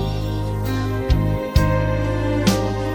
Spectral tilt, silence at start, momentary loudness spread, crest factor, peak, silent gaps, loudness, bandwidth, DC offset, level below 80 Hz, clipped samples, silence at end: -6.5 dB/octave; 0 s; 5 LU; 16 dB; -4 dBFS; none; -21 LUFS; 17.5 kHz; under 0.1%; -26 dBFS; under 0.1%; 0 s